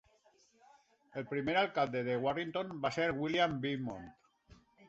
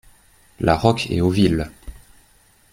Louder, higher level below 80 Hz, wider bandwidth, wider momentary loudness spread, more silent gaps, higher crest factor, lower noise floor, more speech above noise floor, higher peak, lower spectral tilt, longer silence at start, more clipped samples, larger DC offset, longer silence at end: second, -35 LUFS vs -19 LUFS; second, -68 dBFS vs -40 dBFS; second, 8 kHz vs 16 kHz; first, 13 LU vs 8 LU; neither; about the same, 18 dB vs 20 dB; first, -69 dBFS vs -55 dBFS; about the same, 34 dB vs 37 dB; second, -18 dBFS vs -2 dBFS; second, -3.5 dB/octave vs -6.5 dB/octave; first, 1.15 s vs 0.6 s; neither; neither; second, 0.35 s vs 0.8 s